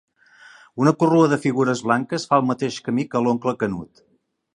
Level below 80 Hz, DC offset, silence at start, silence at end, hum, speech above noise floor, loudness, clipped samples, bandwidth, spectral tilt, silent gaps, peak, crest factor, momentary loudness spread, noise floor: -60 dBFS; under 0.1%; 0.75 s; 0.75 s; none; 30 dB; -20 LUFS; under 0.1%; 11 kHz; -6.5 dB/octave; none; -2 dBFS; 20 dB; 9 LU; -49 dBFS